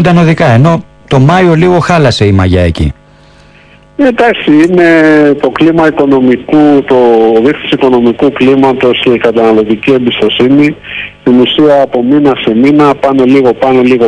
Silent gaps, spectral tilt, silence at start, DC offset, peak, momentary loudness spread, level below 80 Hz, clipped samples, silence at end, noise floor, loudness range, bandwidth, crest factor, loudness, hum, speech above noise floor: none; -7 dB/octave; 0 s; under 0.1%; 0 dBFS; 4 LU; -32 dBFS; 9%; 0 s; -38 dBFS; 2 LU; 11 kHz; 6 dB; -7 LUFS; none; 32 dB